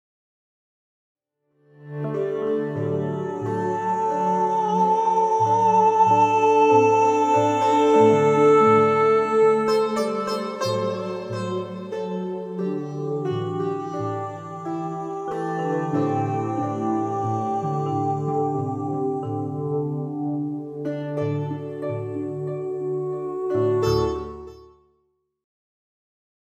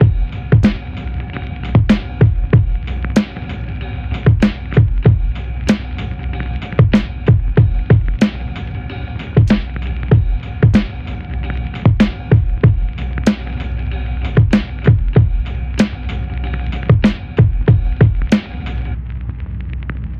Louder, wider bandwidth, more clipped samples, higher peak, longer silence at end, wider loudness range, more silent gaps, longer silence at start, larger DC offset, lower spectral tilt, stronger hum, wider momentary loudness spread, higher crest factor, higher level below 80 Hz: second, -22 LUFS vs -16 LUFS; first, 9.6 kHz vs 7.6 kHz; neither; second, -6 dBFS vs 0 dBFS; first, 1.9 s vs 0 s; first, 11 LU vs 2 LU; neither; first, 1.8 s vs 0 s; second, under 0.1% vs 0.2%; second, -7 dB/octave vs -8.5 dB/octave; neither; about the same, 13 LU vs 12 LU; about the same, 18 dB vs 14 dB; second, -54 dBFS vs -20 dBFS